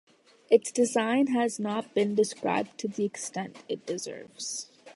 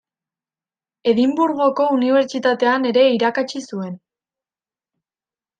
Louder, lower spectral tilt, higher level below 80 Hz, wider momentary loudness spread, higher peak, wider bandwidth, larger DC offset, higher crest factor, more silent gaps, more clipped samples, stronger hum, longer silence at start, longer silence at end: second, -29 LUFS vs -17 LUFS; about the same, -4 dB/octave vs -5 dB/octave; second, -78 dBFS vs -68 dBFS; about the same, 12 LU vs 13 LU; second, -8 dBFS vs -4 dBFS; first, 11.5 kHz vs 9.2 kHz; neither; first, 22 dB vs 16 dB; neither; neither; neither; second, 0.5 s vs 1.05 s; second, 0.05 s vs 1.6 s